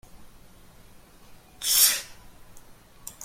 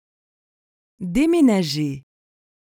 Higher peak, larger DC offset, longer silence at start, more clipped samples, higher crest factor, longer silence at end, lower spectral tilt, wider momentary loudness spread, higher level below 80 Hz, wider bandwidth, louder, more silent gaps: first, -4 dBFS vs -8 dBFS; neither; second, 0.15 s vs 1 s; neither; first, 26 dB vs 16 dB; second, 0 s vs 0.7 s; second, 2 dB/octave vs -6 dB/octave; first, 26 LU vs 17 LU; second, -56 dBFS vs -48 dBFS; about the same, 16.5 kHz vs 17 kHz; about the same, -21 LUFS vs -19 LUFS; neither